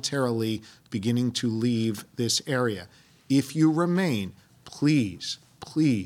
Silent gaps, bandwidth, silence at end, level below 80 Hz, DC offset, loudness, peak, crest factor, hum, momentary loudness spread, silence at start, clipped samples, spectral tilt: none; 16.5 kHz; 0 s; -66 dBFS; under 0.1%; -26 LUFS; -10 dBFS; 16 dB; none; 12 LU; 0.05 s; under 0.1%; -5 dB/octave